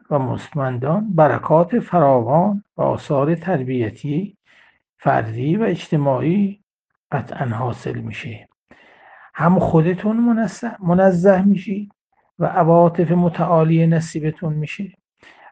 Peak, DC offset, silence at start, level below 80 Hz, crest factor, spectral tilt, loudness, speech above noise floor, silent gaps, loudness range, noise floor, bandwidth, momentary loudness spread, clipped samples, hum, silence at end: 0 dBFS; under 0.1%; 0.1 s; -52 dBFS; 18 dB; -8.5 dB/octave; -18 LUFS; 54 dB; 6.63-6.67 s, 6.73-6.85 s, 6.97-7.10 s, 8.57-8.66 s, 12.01-12.05 s; 6 LU; -71 dBFS; 8.8 kHz; 13 LU; under 0.1%; none; 0.6 s